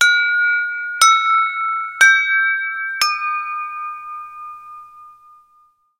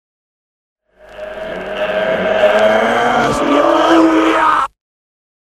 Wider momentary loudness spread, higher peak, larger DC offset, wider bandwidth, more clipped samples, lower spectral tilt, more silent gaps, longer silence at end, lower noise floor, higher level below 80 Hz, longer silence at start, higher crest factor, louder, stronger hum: first, 20 LU vs 15 LU; about the same, 0 dBFS vs 0 dBFS; neither; first, 16 kHz vs 13.5 kHz; neither; second, 4.5 dB/octave vs -4.5 dB/octave; neither; about the same, 0.9 s vs 0.85 s; first, -56 dBFS vs -33 dBFS; second, -66 dBFS vs -44 dBFS; second, 0 s vs 1.1 s; about the same, 18 dB vs 14 dB; about the same, -15 LUFS vs -13 LUFS; neither